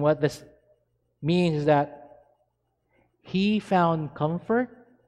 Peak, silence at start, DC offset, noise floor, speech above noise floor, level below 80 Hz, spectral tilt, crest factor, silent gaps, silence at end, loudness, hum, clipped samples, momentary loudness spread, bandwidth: -10 dBFS; 0 s; under 0.1%; -74 dBFS; 50 dB; -60 dBFS; -7.5 dB/octave; 18 dB; none; 0.4 s; -25 LUFS; none; under 0.1%; 11 LU; 11.5 kHz